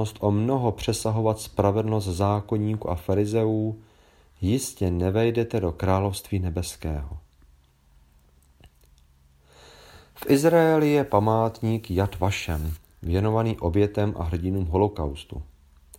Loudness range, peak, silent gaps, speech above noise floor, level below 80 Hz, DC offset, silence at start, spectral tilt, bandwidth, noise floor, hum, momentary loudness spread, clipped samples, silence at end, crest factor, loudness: 8 LU; -4 dBFS; none; 34 dB; -42 dBFS; under 0.1%; 0 s; -6.5 dB/octave; 16.5 kHz; -58 dBFS; none; 11 LU; under 0.1%; 0.55 s; 20 dB; -25 LUFS